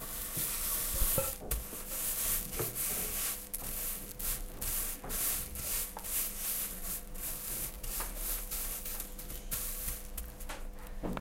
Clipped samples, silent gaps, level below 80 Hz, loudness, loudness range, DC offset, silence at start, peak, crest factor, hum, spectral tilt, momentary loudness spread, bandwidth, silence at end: under 0.1%; none; -44 dBFS; -35 LUFS; 5 LU; under 0.1%; 0 s; -16 dBFS; 22 dB; none; -2 dB/octave; 10 LU; 17 kHz; 0 s